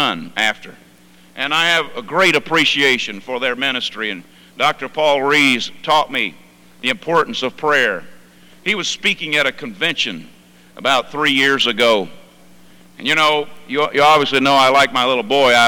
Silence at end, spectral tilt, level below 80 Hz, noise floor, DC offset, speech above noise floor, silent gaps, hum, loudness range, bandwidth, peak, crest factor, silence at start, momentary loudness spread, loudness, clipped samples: 0 s; -2.5 dB/octave; -56 dBFS; -47 dBFS; under 0.1%; 30 dB; none; 60 Hz at -50 dBFS; 3 LU; 19 kHz; -4 dBFS; 14 dB; 0 s; 10 LU; -16 LUFS; under 0.1%